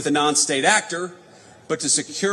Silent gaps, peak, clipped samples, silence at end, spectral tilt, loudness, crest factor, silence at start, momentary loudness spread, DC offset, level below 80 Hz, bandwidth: none; -4 dBFS; under 0.1%; 0 s; -1.5 dB/octave; -19 LUFS; 18 dB; 0 s; 12 LU; under 0.1%; -74 dBFS; 13.5 kHz